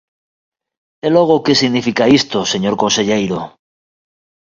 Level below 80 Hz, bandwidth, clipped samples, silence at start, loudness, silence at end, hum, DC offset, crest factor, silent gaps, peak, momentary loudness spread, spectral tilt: -52 dBFS; 7.6 kHz; under 0.1%; 1.05 s; -14 LUFS; 1.05 s; none; under 0.1%; 16 dB; none; 0 dBFS; 10 LU; -4 dB/octave